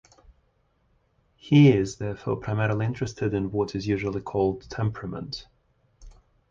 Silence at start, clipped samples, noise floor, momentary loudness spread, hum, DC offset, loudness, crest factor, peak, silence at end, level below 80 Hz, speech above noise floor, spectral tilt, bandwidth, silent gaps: 1.45 s; under 0.1%; -68 dBFS; 16 LU; none; under 0.1%; -25 LUFS; 20 dB; -6 dBFS; 0.4 s; -50 dBFS; 43 dB; -7.5 dB/octave; 7.6 kHz; none